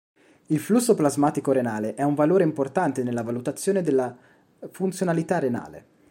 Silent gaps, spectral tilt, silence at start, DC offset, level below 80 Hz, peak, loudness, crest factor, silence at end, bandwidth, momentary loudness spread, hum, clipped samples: none; -6.5 dB/octave; 0.5 s; under 0.1%; -68 dBFS; -6 dBFS; -24 LUFS; 18 dB; 0.3 s; 16.5 kHz; 9 LU; none; under 0.1%